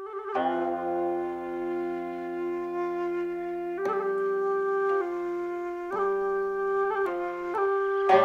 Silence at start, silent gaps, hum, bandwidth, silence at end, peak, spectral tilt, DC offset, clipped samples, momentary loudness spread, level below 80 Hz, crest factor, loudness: 0 s; none; none; 7 kHz; 0 s; -8 dBFS; -6.5 dB/octave; under 0.1%; under 0.1%; 6 LU; -66 dBFS; 20 dB; -29 LUFS